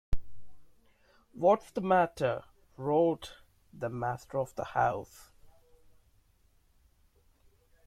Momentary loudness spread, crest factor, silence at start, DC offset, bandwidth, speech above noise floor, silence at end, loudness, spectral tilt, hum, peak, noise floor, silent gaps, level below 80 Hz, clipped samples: 14 LU; 20 dB; 0.1 s; under 0.1%; 15 kHz; 37 dB; 2.35 s; -31 LUFS; -7 dB/octave; none; -14 dBFS; -67 dBFS; none; -50 dBFS; under 0.1%